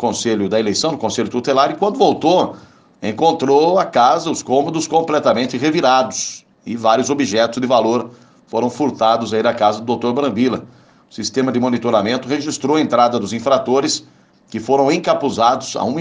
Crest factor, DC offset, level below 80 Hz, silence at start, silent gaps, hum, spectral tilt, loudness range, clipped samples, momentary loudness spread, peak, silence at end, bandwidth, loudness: 16 dB; under 0.1%; -62 dBFS; 0 s; none; none; -4.5 dB/octave; 3 LU; under 0.1%; 8 LU; 0 dBFS; 0 s; 10 kHz; -16 LUFS